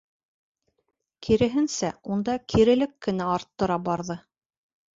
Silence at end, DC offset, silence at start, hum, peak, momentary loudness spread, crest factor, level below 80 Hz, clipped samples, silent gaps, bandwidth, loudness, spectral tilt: 0.75 s; under 0.1%; 1.2 s; none; -8 dBFS; 10 LU; 18 dB; -50 dBFS; under 0.1%; none; 7.8 kHz; -25 LUFS; -5.5 dB/octave